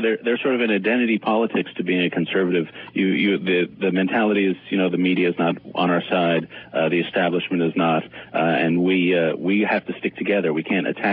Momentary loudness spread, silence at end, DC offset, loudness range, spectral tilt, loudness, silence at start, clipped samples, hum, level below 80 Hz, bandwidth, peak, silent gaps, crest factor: 4 LU; 0 s; under 0.1%; 1 LU; -11 dB/octave; -21 LUFS; 0 s; under 0.1%; none; -66 dBFS; 4.8 kHz; -8 dBFS; none; 14 dB